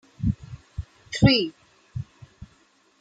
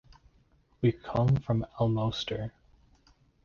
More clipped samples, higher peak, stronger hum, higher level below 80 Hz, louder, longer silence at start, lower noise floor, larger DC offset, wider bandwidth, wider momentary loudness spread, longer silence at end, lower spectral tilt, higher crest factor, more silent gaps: neither; first, -4 dBFS vs -16 dBFS; neither; first, -42 dBFS vs -52 dBFS; first, -23 LUFS vs -30 LUFS; second, 0.2 s vs 0.8 s; second, -61 dBFS vs -65 dBFS; neither; first, 9.2 kHz vs 7 kHz; first, 21 LU vs 8 LU; second, 0.55 s vs 0.95 s; second, -6 dB/octave vs -8 dB/octave; first, 24 dB vs 16 dB; neither